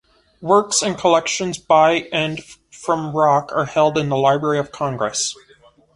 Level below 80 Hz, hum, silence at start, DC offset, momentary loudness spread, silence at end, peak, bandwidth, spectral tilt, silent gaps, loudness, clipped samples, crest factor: -56 dBFS; none; 0.4 s; under 0.1%; 9 LU; 0.6 s; -2 dBFS; 11.5 kHz; -3.5 dB/octave; none; -18 LUFS; under 0.1%; 18 dB